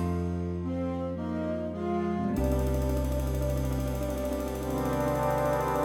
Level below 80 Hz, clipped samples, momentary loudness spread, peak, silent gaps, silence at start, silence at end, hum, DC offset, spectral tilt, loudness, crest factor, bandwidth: -36 dBFS; under 0.1%; 5 LU; -16 dBFS; none; 0 s; 0 s; none; under 0.1%; -7 dB/octave; -30 LUFS; 14 dB; 18 kHz